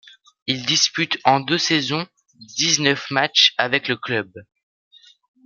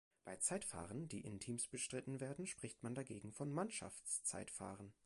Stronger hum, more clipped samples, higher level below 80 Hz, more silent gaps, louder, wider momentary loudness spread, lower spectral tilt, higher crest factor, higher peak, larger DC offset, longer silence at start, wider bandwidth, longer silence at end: neither; neither; first, -68 dBFS vs -74 dBFS; neither; first, -18 LUFS vs -46 LUFS; first, 12 LU vs 8 LU; second, -2 dB/octave vs -4 dB/octave; about the same, 22 dB vs 22 dB; first, 0 dBFS vs -26 dBFS; neither; first, 0.45 s vs 0.25 s; first, 13 kHz vs 11.5 kHz; first, 1.05 s vs 0.15 s